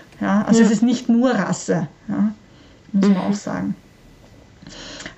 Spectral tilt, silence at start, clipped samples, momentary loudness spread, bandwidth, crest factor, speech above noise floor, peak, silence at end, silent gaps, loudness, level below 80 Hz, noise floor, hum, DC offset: -6 dB/octave; 0.2 s; under 0.1%; 19 LU; 8.4 kHz; 16 dB; 29 dB; -4 dBFS; 0.05 s; none; -19 LUFS; -54 dBFS; -47 dBFS; none; under 0.1%